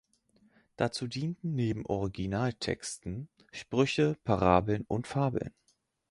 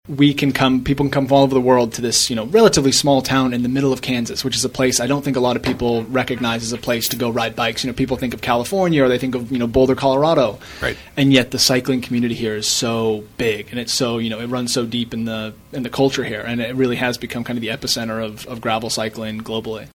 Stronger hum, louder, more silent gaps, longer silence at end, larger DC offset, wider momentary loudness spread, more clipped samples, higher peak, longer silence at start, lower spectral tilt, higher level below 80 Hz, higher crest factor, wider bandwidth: neither; second, -31 LUFS vs -18 LUFS; neither; first, 0.6 s vs 0.15 s; neither; first, 13 LU vs 10 LU; neither; second, -8 dBFS vs 0 dBFS; first, 0.8 s vs 0.05 s; first, -6 dB/octave vs -4 dB/octave; second, -52 dBFS vs -44 dBFS; first, 24 dB vs 18 dB; second, 11.5 kHz vs 19.5 kHz